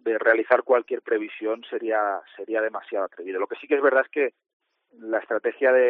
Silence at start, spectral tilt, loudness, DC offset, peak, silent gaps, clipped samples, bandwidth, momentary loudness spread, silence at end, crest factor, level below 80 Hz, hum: 0.05 s; -1 dB/octave; -24 LUFS; under 0.1%; -4 dBFS; 4.53-4.60 s; under 0.1%; 4.3 kHz; 10 LU; 0 s; 20 dB; -84 dBFS; none